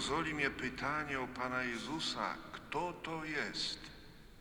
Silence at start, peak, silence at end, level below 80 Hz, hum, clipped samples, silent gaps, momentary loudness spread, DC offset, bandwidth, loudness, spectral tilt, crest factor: 0 s; -20 dBFS; 0 s; -60 dBFS; none; under 0.1%; none; 10 LU; under 0.1%; over 20 kHz; -38 LUFS; -3.5 dB/octave; 20 dB